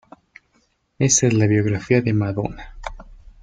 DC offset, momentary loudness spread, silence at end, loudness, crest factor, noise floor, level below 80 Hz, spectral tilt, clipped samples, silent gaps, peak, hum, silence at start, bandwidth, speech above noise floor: under 0.1%; 20 LU; 0.3 s; -19 LUFS; 18 dB; -64 dBFS; -44 dBFS; -5 dB/octave; under 0.1%; none; -2 dBFS; none; 1 s; 9.6 kHz; 46 dB